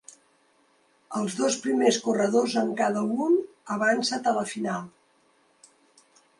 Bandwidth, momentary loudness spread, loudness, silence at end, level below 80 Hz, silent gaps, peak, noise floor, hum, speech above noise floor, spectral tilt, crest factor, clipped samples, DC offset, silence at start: 11.5 kHz; 9 LU; -26 LUFS; 1.5 s; -76 dBFS; none; -8 dBFS; -64 dBFS; none; 40 dB; -4 dB/octave; 20 dB; under 0.1%; under 0.1%; 1.1 s